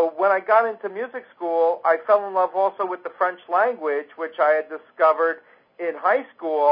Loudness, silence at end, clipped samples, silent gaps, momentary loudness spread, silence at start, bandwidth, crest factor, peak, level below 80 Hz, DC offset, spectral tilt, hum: -22 LUFS; 0 s; under 0.1%; none; 12 LU; 0 s; 5.2 kHz; 16 dB; -6 dBFS; -82 dBFS; under 0.1%; -8 dB/octave; none